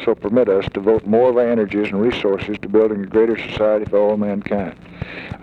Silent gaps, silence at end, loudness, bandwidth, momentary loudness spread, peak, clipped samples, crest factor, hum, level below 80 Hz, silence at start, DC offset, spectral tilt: none; 0 s; -18 LUFS; 6.6 kHz; 9 LU; -4 dBFS; under 0.1%; 14 dB; none; -46 dBFS; 0 s; under 0.1%; -8 dB/octave